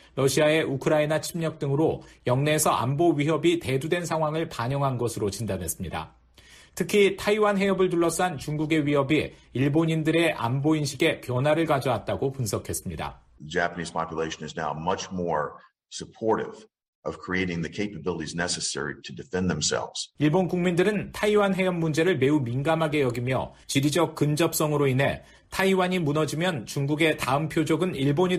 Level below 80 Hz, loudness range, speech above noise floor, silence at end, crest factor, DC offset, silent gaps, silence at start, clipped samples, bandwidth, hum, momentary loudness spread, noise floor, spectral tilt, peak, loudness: -54 dBFS; 6 LU; 28 dB; 0 s; 16 dB; under 0.1%; 16.88-17.03 s; 0.15 s; under 0.1%; 14.5 kHz; none; 9 LU; -53 dBFS; -5 dB/octave; -10 dBFS; -25 LUFS